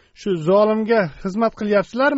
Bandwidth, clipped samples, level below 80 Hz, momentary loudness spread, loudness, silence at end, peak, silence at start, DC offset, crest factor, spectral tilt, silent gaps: 8 kHz; under 0.1%; -50 dBFS; 7 LU; -19 LUFS; 0 s; -4 dBFS; 0.2 s; under 0.1%; 14 dB; -5 dB/octave; none